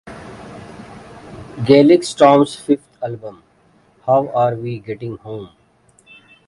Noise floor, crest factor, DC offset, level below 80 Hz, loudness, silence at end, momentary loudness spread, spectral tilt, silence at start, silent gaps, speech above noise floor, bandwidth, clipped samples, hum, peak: -55 dBFS; 18 dB; under 0.1%; -54 dBFS; -15 LUFS; 1 s; 25 LU; -6.5 dB/octave; 0.05 s; none; 40 dB; 11.5 kHz; under 0.1%; none; 0 dBFS